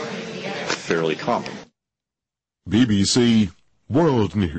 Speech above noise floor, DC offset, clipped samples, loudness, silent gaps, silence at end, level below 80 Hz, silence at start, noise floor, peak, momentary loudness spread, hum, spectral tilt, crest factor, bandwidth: 70 dB; under 0.1%; under 0.1%; -21 LUFS; none; 0 s; -48 dBFS; 0 s; -88 dBFS; -8 dBFS; 13 LU; none; -5 dB/octave; 14 dB; 8.8 kHz